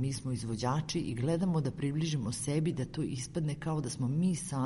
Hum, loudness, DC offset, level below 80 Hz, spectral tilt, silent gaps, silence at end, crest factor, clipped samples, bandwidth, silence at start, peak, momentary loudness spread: none; -34 LUFS; under 0.1%; -56 dBFS; -6 dB/octave; none; 0 s; 14 dB; under 0.1%; 11.5 kHz; 0 s; -18 dBFS; 5 LU